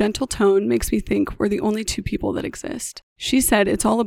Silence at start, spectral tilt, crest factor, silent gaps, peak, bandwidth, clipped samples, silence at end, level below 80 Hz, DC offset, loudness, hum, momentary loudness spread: 0 s; -4 dB/octave; 18 dB; 3.03-3.16 s; -2 dBFS; 18 kHz; under 0.1%; 0 s; -38 dBFS; under 0.1%; -21 LUFS; none; 12 LU